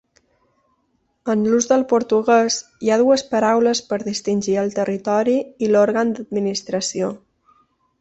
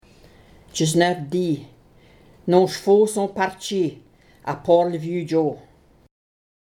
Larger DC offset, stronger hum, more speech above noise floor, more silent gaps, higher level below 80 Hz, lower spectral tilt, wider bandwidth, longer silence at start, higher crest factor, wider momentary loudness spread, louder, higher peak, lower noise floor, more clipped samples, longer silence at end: neither; neither; first, 49 dB vs 32 dB; neither; about the same, -62 dBFS vs -58 dBFS; second, -4 dB/octave vs -5.5 dB/octave; second, 8.2 kHz vs 16.5 kHz; first, 1.25 s vs 0.75 s; about the same, 16 dB vs 20 dB; second, 7 LU vs 13 LU; about the same, -19 LUFS vs -21 LUFS; about the same, -2 dBFS vs -2 dBFS; first, -67 dBFS vs -52 dBFS; neither; second, 0.85 s vs 1.15 s